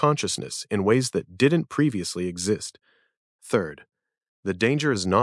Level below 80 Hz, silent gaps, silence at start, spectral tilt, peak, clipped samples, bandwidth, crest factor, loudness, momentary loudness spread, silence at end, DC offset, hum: -66 dBFS; 3.17-3.39 s, 4.28-4.43 s; 0 s; -5 dB/octave; -6 dBFS; under 0.1%; 12 kHz; 20 dB; -24 LUFS; 8 LU; 0 s; under 0.1%; none